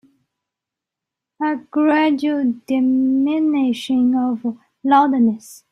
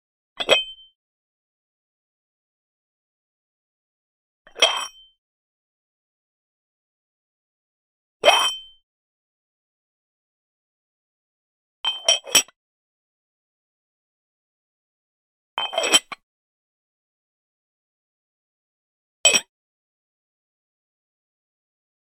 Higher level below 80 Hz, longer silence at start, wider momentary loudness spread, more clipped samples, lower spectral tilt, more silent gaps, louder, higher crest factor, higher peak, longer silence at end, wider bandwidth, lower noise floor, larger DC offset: about the same, -66 dBFS vs -70 dBFS; first, 1.4 s vs 0.4 s; second, 9 LU vs 18 LU; neither; first, -5.5 dB/octave vs 1.5 dB/octave; second, none vs 0.95-4.45 s, 5.18-8.20 s, 8.83-11.84 s, 12.56-15.57 s, 16.23-19.24 s; about the same, -18 LUFS vs -19 LUFS; second, 16 dB vs 30 dB; about the same, -2 dBFS vs 0 dBFS; second, 0.15 s vs 2.7 s; second, 12.5 kHz vs 16 kHz; second, -85 dBFS vs under -90 dBFS; neither